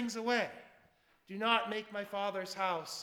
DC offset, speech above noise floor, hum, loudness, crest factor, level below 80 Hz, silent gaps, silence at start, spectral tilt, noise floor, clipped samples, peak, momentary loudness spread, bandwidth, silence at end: under 0.1%; 33 dB; none; -35 LUFS; 22 dB; -82 dBFS; none; 0 s; -3 dB/octave; -69 dBFS; under 0.1%; -14 dBFS; 10 LU; 19.5 kHz; 0 s